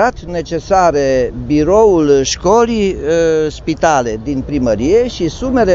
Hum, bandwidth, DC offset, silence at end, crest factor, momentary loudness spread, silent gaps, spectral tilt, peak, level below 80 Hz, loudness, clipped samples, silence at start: none; 7.8 kHz; under 0.1%; 0 s; 12 dB; 9 LU; none; -5 dB/octave; 0 dBFS; -30 dBFS; -13 LUFS; under 0.1%; 0 s